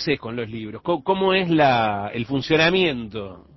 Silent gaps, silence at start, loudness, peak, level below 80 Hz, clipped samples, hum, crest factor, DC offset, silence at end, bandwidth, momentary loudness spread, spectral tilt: none; 0 s; -21 LUFS; -6 dBFS; -52 dBFS; under 0.1%; none; 14 dB; under 0.1%; 0.15 s; 6.2 kHz; 13 LU; -6 dB/octave